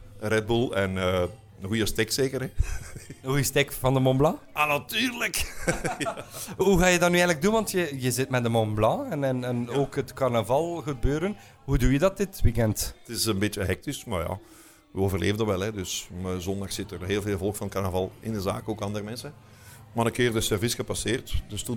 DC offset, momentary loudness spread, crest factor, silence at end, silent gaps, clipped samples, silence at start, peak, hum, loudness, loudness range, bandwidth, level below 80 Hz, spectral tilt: under 0.1%; 10 LU; 20 dB; 0 s; none; under 0.1%; 0 s; -6 dBFS; none; -27 LUFS; 6 LU; 19 kHz; -38 dBFS; -5 dB/octave